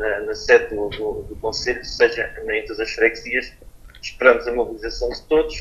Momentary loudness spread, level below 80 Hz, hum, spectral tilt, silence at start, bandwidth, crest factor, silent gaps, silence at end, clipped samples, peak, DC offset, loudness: 11 LU; -40 dBFS; none; -3.5 dB/octave; 0 s; 12.5 kHz; 20 dB; none; 0 s; under 0.1%; 0 dBFS; under 0.1%; -20 LUFS